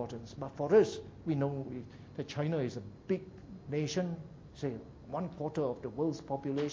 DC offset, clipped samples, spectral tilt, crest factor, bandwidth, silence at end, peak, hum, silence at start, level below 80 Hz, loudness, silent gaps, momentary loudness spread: under 0.1%; under 0.1%; -7 dB/octave; 20 dB; 7.6 kHz; 0 s; -16 dBFS; none; 0 s; -62 dBFS; -35 LUFS; none; 17 LU